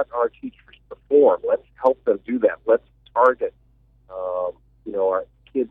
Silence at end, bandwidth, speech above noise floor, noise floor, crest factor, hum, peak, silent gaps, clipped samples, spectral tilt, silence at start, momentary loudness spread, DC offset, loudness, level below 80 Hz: 0.05 s; 3.9 kHz; 37 dB; -57 dBFS; 18 dB; none; -4 dBFS; none; under 0.1%; -8 dB/octave; 0 s; 14 LU; under 0.1%; -22 LUFS; -58 dBFS